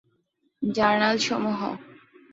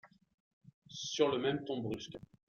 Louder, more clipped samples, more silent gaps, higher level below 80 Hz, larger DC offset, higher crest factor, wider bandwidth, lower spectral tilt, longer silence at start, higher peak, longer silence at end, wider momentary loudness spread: first, -24 LUFS vs -36 LUFS; neither; second, none vs 0.34-0.61 s, 0.74-0.82 s; first, -64 dBFS vs -72 dBFS; neither; about the same, 20 dB vs 22 dB; about the same, 7.8 kHz vs 7.2 kHz; about the same, -4 dB/octave vs -4.5 dB/octave; first, 0.6 s vs 0.05 s; first, -6 dBFS vs -16 dBFS; first, 0.4 s vs 0.25 s; second, 12 LU vs 15 LU